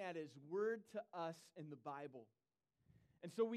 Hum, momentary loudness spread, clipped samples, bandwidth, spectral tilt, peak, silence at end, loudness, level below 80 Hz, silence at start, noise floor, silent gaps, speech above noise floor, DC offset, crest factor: none; 13 LU; under 0.1%; 13 kHz; -6 dB/octave; -28 dBFS; 0 s; -49 LUFS; under -90 dBFS; 0 s; -79 dBFS; none; 31 dB; under 0.1%; 20 dB